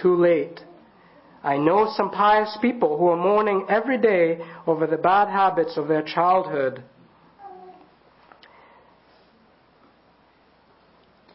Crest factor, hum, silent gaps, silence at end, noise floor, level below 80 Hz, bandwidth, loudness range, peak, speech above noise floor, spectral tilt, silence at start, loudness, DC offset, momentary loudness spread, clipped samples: 18 dB; none; none; 3.65 s; -58 dBFS; -66 dBFS; 5.8 kHz; 7 LU; -6 dBFS; 38 dB; -10.5 dB/octave; 0 s; -21 LUFS; under 0.1%; 9 LU; under 0.1%